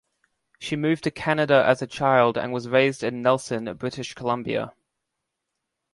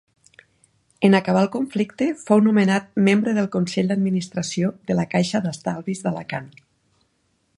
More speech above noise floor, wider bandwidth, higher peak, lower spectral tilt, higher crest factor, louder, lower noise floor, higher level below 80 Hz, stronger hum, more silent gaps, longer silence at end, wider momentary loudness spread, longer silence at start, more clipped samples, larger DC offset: first, 59 dB vs 47 dB; about the same, 11.5 kHz vs 11 kHz; about the same, -4 dBFS vs -2 dBFS; about the same, -5.5 dB/octave vs -6 dB/octave; about the same, 20 dB vs 20 dB; about the same, -23 LUFS vs -21 LUFS; first, -81 dBFS vs -68 dBFS; about the same, -62 dBFS vs -62 dBFS; neither; neither; first, 1.25 s vs 1.1 s; about the same, 12 LU vs 10 LU; second, 0.6 s vs 1 s; neither; neither